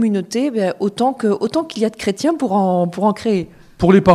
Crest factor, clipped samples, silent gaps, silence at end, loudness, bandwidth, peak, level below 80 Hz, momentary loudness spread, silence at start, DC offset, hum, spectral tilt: 16 dB; under 0.1%; none; 0 s; -18 LUFS; 13 kHz; 0 dBFS; -46 dBFS; 5 LU; 0 s; under 0.1%; none; -6.5 dB/octave